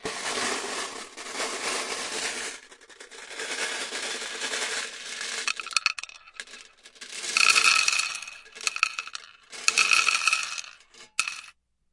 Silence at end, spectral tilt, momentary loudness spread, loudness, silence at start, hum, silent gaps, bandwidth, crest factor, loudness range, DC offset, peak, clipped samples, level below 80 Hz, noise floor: 0.45 s; 1.5 dB/octave; 22 LU; -25 LUFS; 0 s; none; none; 11.5 kHz; 28 dB; 9 LU; under 0.1%; 0 dBFS; under 0.1%; -70 dBFS; -54 dBFS